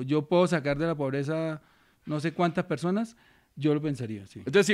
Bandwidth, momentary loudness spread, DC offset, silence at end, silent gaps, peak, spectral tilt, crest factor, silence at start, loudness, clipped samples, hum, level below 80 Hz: 14 kHz; 13 LU; under 0.1%; 0 s; none; -10 dBFS; -6 dB/octave; 18 dB; 0 s; -28 LUFS; under 0.1%; none; -60 dBFS